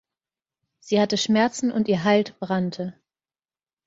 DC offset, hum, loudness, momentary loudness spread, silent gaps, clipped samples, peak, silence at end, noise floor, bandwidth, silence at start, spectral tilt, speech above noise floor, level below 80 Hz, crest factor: under 0.1%; none; -22 LUFS; 8 LU; none; under 0.1%; -6 dBFS; 0.95 s; under -90 dBFS; 7.8 kHz; 0.85 s; -5 dB/octave; over 68 dB; -64 dBFS; 18 dB